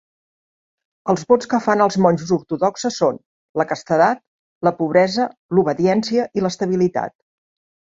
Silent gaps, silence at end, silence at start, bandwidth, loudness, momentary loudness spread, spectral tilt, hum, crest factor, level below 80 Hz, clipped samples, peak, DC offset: 3.26-3.54 s, 4.27-4.61 s, 5.37-5.49 s; 0.8 s; 1.05 s; 7.8 kHz; -19 LUFS; 7 LU; -6 dB/octave; none; 18 dB; -60 dBFS; under 0.1%; -2 dBFS; under 0.1%